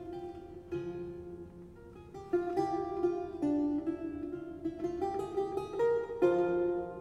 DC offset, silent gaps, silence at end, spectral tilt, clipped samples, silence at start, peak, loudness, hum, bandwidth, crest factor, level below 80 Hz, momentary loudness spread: under 0.1%; none; 0 s; -8 dB/octave; under 0.1%; 0 s; -16 dBFS; -34 LUFS; none; 9.2 kHz; 18 dB; -60 dBFS; 18 LU